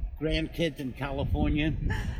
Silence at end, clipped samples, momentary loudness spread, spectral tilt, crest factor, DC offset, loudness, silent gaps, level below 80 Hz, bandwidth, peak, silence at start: 0 s; under 0.1%; 6 LU; -7 dB/octave; 14 dB; under 0.1%; -30 LUFS; none; -34 dBFS; 16 kHz; -14 dBFS; 0 s